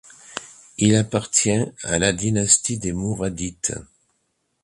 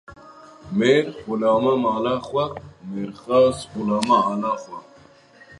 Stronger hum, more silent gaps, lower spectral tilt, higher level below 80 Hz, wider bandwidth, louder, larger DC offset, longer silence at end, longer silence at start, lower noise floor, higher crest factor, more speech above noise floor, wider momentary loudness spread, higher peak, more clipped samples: neither; neither; second, -4 dB/octave vs -6 dB/octave; first, -46 dBFS vs -56 dBFS; about the same, 11.5 kHz vs 11.5 kHz; about the same, -20 LUFS vs -21 LUFS; neither; about the same, 0.8 s vs 0.8 s; first, 0.3 s vs 0.1 s; first, -71 dBFS vs -50 dBFS; about the same, 22 dB vs 22 dB; first, 50 dB vs 29 dB; first, 18 LU vs 13 LU; about the same, -2 dBFS vs 0 dBFS; neither